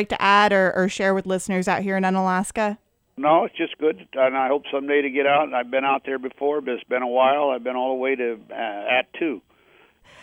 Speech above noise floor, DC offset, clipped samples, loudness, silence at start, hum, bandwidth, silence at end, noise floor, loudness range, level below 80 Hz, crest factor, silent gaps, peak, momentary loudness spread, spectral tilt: 35 dB; under 0.1%; under 0.1%; -22 LUFS; 0 s; none; 15.5 kHz; 0.85 s; -56 dBFS; 2 LU; -60 dBFS; 18 dB; none; -4 dBFS; 9 LU; -5 dB/octave